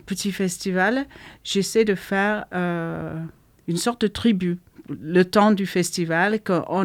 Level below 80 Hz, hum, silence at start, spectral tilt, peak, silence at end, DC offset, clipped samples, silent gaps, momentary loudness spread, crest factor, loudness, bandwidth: -56 dBFS; none; 0.05 s; -5 dB/octave; -4 dBFS; 0 s; under 0.1%; under 0.1%; none; 15 LU; 18 dB; -22 LUFS; 16.5 kHz